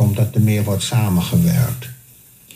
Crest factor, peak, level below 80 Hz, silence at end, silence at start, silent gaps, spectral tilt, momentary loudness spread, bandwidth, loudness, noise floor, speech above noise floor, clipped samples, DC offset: 14 dB; -4 dBFS; -48 dBFS; 0.6 s; 0 s; none; -6 dB/octave; 8 LU; 15.5 kHz; -17 LUFS; -46 dBFS; 30 dB; under 0.1%; under 0.1%